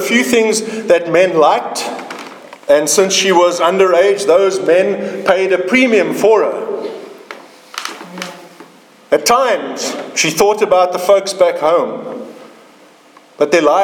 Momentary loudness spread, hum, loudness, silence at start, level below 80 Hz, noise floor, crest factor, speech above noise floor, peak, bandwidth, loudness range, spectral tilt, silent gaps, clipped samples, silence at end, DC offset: 18 LU; none; -13 LUFS; 0 s; -58 dBFS; -44 dBFS; 14 dB; 32 dB; 0 dBFS; 19 kHz; 7 LU; -3 dB/octave; none; under 0.1%; 0 s; under 0.1%